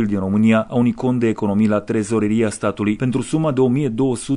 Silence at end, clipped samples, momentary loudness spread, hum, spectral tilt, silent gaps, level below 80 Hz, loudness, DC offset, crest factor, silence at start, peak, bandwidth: 0 s; under 0.1%; 5 LU; none; -7 dB/octave; none; -50 dBFS; -18 LUFS; under 0.1%; 12 dB; 0 s; -4 dBFS; 11 kHz